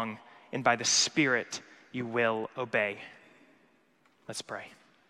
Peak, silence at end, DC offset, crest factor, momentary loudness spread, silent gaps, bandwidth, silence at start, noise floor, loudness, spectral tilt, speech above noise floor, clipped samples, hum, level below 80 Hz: -12 dBFS; 0.35 s; under 0.1%; 22 dB; 19 LU; none; 13.5 kHz; 0 s; -67 dBFS; -29 LUFS; -2 dB/octave; 37 dB; under 0.1%; none; -78 dBFS